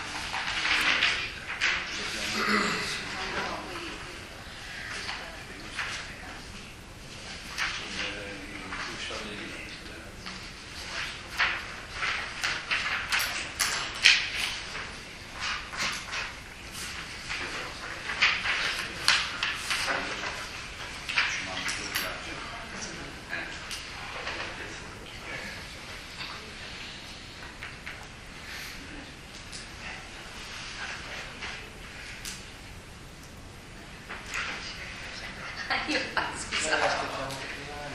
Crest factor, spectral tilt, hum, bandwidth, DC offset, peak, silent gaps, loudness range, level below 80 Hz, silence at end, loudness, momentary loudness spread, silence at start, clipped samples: 32 dB; -1.5 dB/octave; none; 15 kHz; under 0.1%; 0 dBFS; none; 13 LU; -50 dBFS; 0 s; -31 LUFS; 16 LU; 0 s; under 0.1%